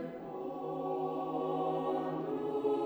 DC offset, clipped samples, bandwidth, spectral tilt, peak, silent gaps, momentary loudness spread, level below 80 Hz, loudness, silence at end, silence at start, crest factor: under 0.1%; under 0.1%; over 20 kHz; -8.5 dB/octave; -22 dBFS; none; 7 LU; -74 dBFS; -36 LUFS; 0 s; 0 s; 14 dB